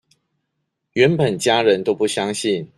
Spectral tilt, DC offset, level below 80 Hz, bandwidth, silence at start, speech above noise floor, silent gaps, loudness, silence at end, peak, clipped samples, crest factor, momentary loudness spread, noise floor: -4.5 dB/octave; under 0.1%; -60 dBFS; 12.5 kHz; 0.95 s; 57 dB; none; -18 LUFS; 0.1 s; -2 dBFS; under 0.1%; 18 dB; 6 LU; -75 dBFS